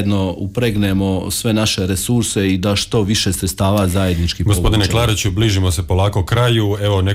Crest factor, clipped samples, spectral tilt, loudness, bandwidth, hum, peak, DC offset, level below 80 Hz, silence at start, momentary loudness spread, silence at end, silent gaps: 10 dB; under 0.1%; -5 dB/octave; -16 LUFS; 16 kHz; none; -6 dBFS; under 0.1%; -30 dBFS; 0 s; 3 LU; 0 s; none